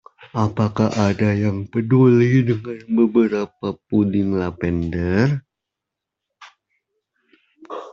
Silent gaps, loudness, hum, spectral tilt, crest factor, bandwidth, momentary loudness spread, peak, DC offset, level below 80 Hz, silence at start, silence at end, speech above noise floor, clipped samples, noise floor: none; -19 LUFS; none; -8.5 dB/octave; 16 dB; 7.6 kHz; 11 LU; -2 dBFS; under 0.1%; -52 dBFS; 0.2 s; 0 s; 66 dB; under 0.1%; -84 dBFS